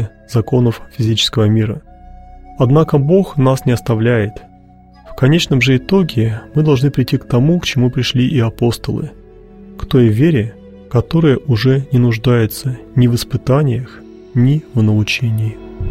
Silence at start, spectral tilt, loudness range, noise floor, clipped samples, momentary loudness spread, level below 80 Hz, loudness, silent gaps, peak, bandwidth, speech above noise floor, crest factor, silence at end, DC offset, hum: 0 s; -7 dB/octave; 2 LU; -42 dBFS; under 0.1%; 9 LU; -38 dBFS; -14 LUFS; none; 0 dBFS; 15.5 kHz; 29 dB; 14 dB; 0 s; 0.3%; none